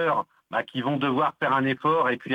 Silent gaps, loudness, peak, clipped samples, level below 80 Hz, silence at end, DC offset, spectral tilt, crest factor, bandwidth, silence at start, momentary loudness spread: none; -25 LUFS; -10 dBFS; under 0.1%; -68 dBFS; 0 s; under 0.1%; -7.5 dB/octave; 14 dB; 9 kHz; 0 s; 7 LU